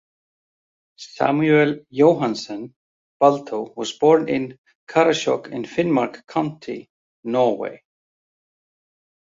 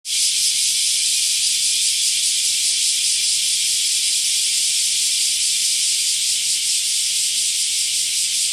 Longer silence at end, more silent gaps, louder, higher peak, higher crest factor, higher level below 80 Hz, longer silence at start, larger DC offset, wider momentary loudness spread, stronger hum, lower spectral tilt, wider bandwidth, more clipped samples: first, 1.6 s vs 0 s; first, 2.76-3.20 s, 4.58-4.64 s, 4.75-4.87 s, 6.90-7.23 s vs none; second, -20 LUFS vs -16 LUFS; about the same, -2 dBFS vs -4 dBFS; first, 20 dB vs 14 dB; about the same, -66 dBFS vs -62 dBFS; first, 1 s vs 0.05 s; neither; first, 17 LU vs 1 LU; neither; first, -6 dB/octave vs 5 dB/octave; second, 7.8 kHz vs 16.5 kHz; neither